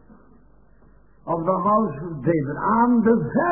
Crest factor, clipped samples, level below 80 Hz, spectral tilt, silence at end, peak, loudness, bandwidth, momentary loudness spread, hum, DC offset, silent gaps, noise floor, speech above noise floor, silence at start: 16 dB; under 0.1%; -52 dBFS; -13.5 dB/octave; 0 s; -6 dBFS; -21 LUFS; 2.9 kHz; 10 LU; none; 0.2%; none; -54 dBFS; 34 dB; 1.25 s